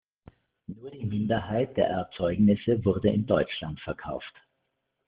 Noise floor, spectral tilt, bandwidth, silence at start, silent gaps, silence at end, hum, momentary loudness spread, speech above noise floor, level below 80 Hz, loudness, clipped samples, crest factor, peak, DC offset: -79 dBFS; -6.5 dB/octave; 4.9 kHz; 0.7 s; none; 0.8 s; none; 19 LU; 52 dB; -54 dBFS; -27 LUFS; under 0.1%; 20 dB; -8 dBFS; under 0.1%